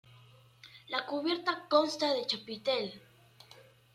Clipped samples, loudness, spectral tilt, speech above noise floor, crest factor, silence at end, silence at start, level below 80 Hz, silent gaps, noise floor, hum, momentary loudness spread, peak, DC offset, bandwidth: under 0.1%; -32 LUFS; -3.5 dB/octave; 27 dB; 22 dB; 0.3 s; 0.65 s; -80 dBFS; none; -59 dBFS; none; 19 LU; -12 dBFS; under 0.1%; 14 kHz